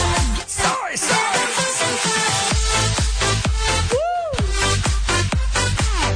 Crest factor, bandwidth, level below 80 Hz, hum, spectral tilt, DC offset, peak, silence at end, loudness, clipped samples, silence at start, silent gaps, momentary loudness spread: 12 dB; 10 kHz; -24 dBFS; none; -3 dB/octave; under 0.1%; -6 dBFS; 0 s; -19 LUFS; under 0.1%; 0 s; none; 3 LU